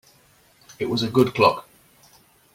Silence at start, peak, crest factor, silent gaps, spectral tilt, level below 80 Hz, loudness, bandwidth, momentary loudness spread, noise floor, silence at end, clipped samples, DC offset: 0.7 s; -4 dBFS; 22 dB; none; -6 dB/octave; -58 dBFS; -21 LUFS; 16.5 kHz; 13 LU; -57 dBFS; 0.95 s; under 0.1%; under 0.1%